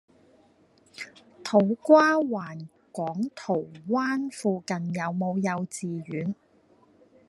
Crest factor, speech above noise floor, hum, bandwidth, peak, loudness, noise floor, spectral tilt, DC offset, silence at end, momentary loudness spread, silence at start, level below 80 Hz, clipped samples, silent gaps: 22 dB; 35 dB; none; 12 kHz; -4 dBFS; -26 LUFS; -61 dBFS; -6 dB/octave; under 0.1%; 0.95 s; 21 LU; 1 s; -74 dBFS; under 0.1%; none